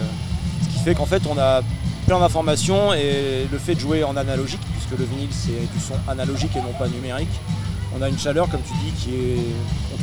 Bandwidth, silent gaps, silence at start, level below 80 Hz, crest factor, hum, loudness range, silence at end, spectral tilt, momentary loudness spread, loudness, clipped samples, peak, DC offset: over 20 kHz; none; 0 s; -32 dBFS; 18 dB; none; 5 LU; 0 s; -5.5 dB/octave; 8 LU; -22 LUFS; under 0.1%; -4 dBFS; 0.6%